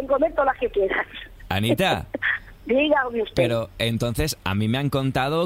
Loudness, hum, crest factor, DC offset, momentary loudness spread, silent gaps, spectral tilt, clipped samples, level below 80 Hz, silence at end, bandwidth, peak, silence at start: -23 LUFS; none; 16 dB; under 0.1%; 5 LU; none; -5.5 dB/octave; under 0.1%; -42 dBFS; 0 s; 16 kHz; -6 dBFS; 0 s